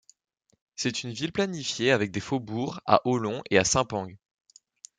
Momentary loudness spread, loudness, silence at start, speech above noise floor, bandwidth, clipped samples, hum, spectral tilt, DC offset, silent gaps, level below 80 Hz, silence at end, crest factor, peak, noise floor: 9 LU; -27 LUFS; 0.8 s; 27 dB; 10 kHz; under 0.1%; none; -4 dB/octave; under 0.1%; none; -58 dBFS; 0.85 s; 26 dB; -4 dBFS; -53 dBFS